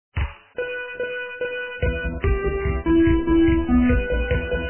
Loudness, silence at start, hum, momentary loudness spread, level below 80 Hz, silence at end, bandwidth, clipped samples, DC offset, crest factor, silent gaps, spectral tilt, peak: -22 LUFS; 0.1 s; none; 11 LU; -28 dBFS; 0 s; 3.2 kHz; under 0.1%; under 0.1%; 14 dB; none; -11.5 dB/octave; -8 dBFS